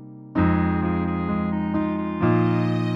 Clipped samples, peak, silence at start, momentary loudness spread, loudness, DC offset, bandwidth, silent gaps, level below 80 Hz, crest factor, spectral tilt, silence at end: under 0.1%; -8 dBFS; 0 s; 4 LU; -23 LUFS; under 0.1%; 5.4 kHz; none; -42 dBFS; 14 dB; -9.5 dB/octave; 0 s